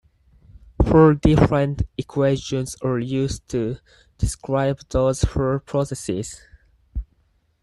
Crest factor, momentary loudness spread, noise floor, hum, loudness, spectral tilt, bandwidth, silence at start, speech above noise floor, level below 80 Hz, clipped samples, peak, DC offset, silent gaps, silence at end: 18 dB; 19 LU; -63 dBFS; none; -21 LUFS; -7 dB/octave; 12.5 kHz; 0.55 s; 43 dB; -32 dBFS; under 0.1%; -2 dBFS; under 0.1%; none; 0.6 s